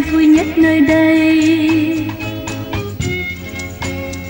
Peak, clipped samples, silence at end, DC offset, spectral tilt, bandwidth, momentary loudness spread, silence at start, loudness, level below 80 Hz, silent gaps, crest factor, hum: -2 dBFS; under 0.1%; 0 s; under 0.1%; -6 dB/octave; 16.5 kHz; 12 LU; 0 s; -14 LUFS; -36 dBFS; none; 12 dB; none